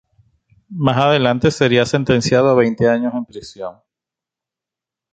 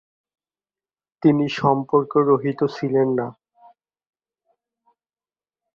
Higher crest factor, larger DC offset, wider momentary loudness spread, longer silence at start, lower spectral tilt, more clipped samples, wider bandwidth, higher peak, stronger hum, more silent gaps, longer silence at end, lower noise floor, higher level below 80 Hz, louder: about the same, 16 dB vs 20 dB; neither; first, 17 LU vs 5 LU; second, 0.7 s vs 1.25 s; second, -6 dB/octave vs -8 dB/octave; neither; first, 9.2 kHz vs 7 kHz; about the same, 0 dBFS vs -2 dBFS; neither; neither; second, 1.4 s vs 2.45 s; about the same, -87 dBFS vs under -90 dBFS; first, -48 dBFS vs -66 dBFS; first, -15 LUFS vs -20 LUFS